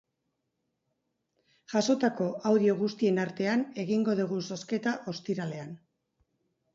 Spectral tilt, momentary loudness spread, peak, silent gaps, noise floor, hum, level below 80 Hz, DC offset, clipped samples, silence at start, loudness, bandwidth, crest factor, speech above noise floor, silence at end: -6 dB/octave; 9 LU; -12 dBFS; none; -81 dBFS; none; -76 dBFS; under 0.1%; under 0.1%; 1.7 s; -29 LUFS; 7.8 kHz; 18 dB; 53 dB; 1 s